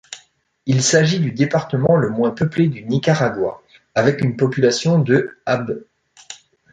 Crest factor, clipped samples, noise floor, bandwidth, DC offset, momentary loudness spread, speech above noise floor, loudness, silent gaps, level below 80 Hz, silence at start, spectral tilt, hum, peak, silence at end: 16 dB; under 0.1%; -54 dBFS; 9.4 kHz; under 0.1%; 16 LU; 37 dB; -18 LUFS; none; -54 dBFS; 0.1 s; -5.5 dB/octave; none; -2 dBFS; 0.35 s